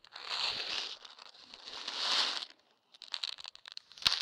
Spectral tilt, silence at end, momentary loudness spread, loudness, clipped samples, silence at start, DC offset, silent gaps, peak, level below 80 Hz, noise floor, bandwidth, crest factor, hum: 0.5 dB/octave; 0 s; 20 LU; -35 LUFS; under 0.1%; 0.1 s; under 0.1%; none; -4 dBFS; -72 dBFS; -66 dBFS; 17.5 kHz; 34 dB; none